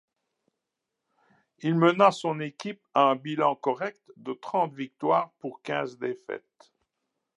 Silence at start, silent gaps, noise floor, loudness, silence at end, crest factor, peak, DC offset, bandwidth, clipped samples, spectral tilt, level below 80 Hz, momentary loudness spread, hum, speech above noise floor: 1.6 s; none; -85 dBFS; -27 LUFS; 1 s; 22 dB; -6 dBFS; under 0.1%; 11 kHz; under 0.1%; -6.5 dB/octave; -84 dBFS; 16 LU; none; 58 dB